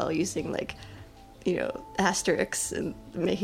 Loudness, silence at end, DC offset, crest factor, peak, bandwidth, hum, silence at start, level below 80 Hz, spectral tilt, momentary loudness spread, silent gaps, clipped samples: -30 LUFS; 0 s; under 0.1%; 22 dB; -8 dBFS; 16 kHz; none; 0 s; -54 dBFS; -4 dB/octave; 13 LU; none; under 0.1%